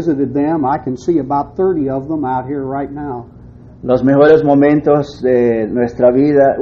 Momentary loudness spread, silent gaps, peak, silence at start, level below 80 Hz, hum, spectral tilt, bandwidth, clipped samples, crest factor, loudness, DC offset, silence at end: 12 LU; none; 0 dBFS; 0 s; -42 dBFS; none; -9 dB/octave; 7 kHz; under 0.1%; 14 dB; -14 LUFS; under 0.1%; 0 s